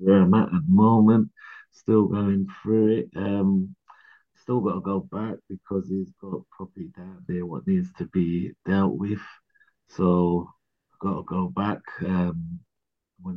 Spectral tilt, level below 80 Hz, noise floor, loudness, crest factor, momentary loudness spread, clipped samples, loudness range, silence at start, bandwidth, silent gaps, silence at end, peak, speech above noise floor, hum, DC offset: -10.5 dB/octave; -58 dBFS; -83 dBFS; -24 LUFS; 18 dB; 20 LU; under 0.1%; 9 LU; 0 s; 5 kHz; none; 0 s; -6 dBFS; 60 dB; none; under 0.1%